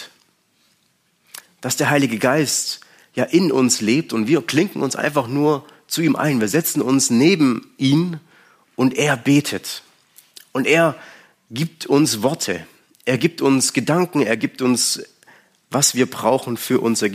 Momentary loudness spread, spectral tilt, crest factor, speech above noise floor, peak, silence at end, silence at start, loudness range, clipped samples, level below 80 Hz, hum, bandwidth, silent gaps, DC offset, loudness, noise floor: 12 LU; -4 dB/octave; 16 dB; 45 dB; -2 dBFS; 0 s; 0 s; 3 LU; under 0.1%; -66 dBFS; none; 15.5 kHz; none; under 0.1%; -18 LUFS; -63 dBFS